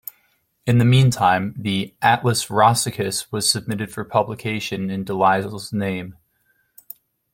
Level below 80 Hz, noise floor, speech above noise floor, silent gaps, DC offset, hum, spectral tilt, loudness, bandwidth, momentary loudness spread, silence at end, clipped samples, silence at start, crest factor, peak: -54 dBFS; -65 dBFS; 46 dB; none; under 0.1%; none; -4.5 dB/octave; -20 LUFS; 16.5 kHz; 15 LU; 1.2 s; under 0.1%; 0.65 s; 18 dB; -2 dBFS